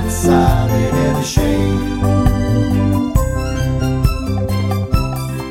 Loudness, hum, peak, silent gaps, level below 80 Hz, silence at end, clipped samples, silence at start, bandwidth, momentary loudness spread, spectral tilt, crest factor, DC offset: -16 LUFS; none; 0 dBFS; none; -22 dBFS; 0 s; under 0.1%; 0 s; 16.5 kHz; 5 LU; -6.5 dB/octave; 14 dB; under 0.1%